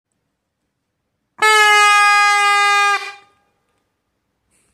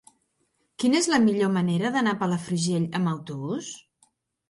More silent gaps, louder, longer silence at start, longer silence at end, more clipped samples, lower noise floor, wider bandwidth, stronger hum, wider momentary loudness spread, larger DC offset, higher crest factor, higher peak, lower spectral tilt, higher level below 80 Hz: neither; first, -11 LUFS vs -25 LUFS; first, 1.4 s vs 0.8 s; first, 1.6 s vs 0.7 s; neither; about the same, -73 dBFS vs -72 dBFS; first, 16 kHz vs 11.5 kHz; neither; second, 8 LU vs 11 LU; neither; about the same, 16 dB vs 20 dB; first, 0 dBFS vs -6 dBFS; second, 2.5 dB/octave vs -5 dB/octave; about the same, -72 dBFS vs -68 dBFS